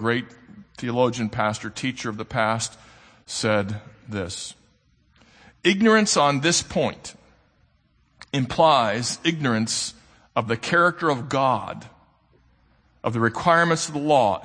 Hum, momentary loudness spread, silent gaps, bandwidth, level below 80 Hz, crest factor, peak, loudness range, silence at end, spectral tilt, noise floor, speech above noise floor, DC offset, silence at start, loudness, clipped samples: none; 14 LU; none; 9.8 kHz; -56 dBFS; 20 dB; -4 dBFS; 5 LU; 0 s; -4 dB/octave; -63 dBFS; 41 dB; under 0.1%; 0 s; -22 LUFS; under 0.1%